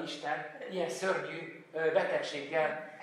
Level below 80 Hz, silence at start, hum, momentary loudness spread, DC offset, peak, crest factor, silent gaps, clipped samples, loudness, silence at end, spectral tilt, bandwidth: under -90 dBFS; 0 s; none; 10 LU; under 0.1%; -16 dBFS; 18 dB; none; under 0.1%; -34 LUFS; 0 s; -4 dB/octave; 14 kHz